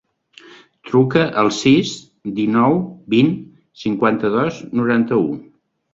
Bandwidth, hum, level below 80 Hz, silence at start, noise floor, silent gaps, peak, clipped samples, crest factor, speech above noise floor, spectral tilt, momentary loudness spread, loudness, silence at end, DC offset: 7.8 kHz; none; -56 dBFS; 0.85 s; -46 dBFS; none; 0 dBFS; under 0.1%; 18 dB; 30 dB; -6 dB/octave; 12 LU; -17 LUFS; 0.5 s; under 0.1%